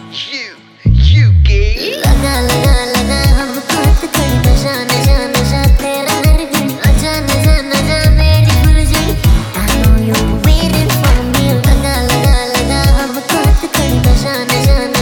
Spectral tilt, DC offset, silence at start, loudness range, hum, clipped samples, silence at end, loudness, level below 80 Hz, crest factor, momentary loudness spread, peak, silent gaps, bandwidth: -5 dB/octave; under 0.1%; 0 s; 1 LU; none; under 0.1%; 0 s; -11 LUFS; -14 dBFS; 10 dB; 5 LU; 0 dBFS; none; 19.5 kHz